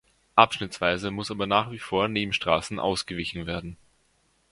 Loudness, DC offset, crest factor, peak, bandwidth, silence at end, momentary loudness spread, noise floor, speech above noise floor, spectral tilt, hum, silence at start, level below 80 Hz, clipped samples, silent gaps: -26 LUFS; under 0.1%; 26 dB; 0 dBFS; 11.5 kHz; 0.75 s; 11 LU; -67 dBFS; 41 dB; -4.5 dB/octave; none; 0.35 s; -52 dBFS; under 0.1%; none